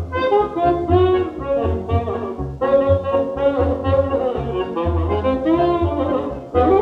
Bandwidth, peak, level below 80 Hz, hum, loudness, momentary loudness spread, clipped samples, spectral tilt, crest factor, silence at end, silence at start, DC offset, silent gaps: 6 kHz; -4 dBFS; -36 dBFS; none; -19 LUFS; 7 LU; under 0.1%; -9.5 dB/octave; 14 dB; 0 s; 0 s; under 0.1%; none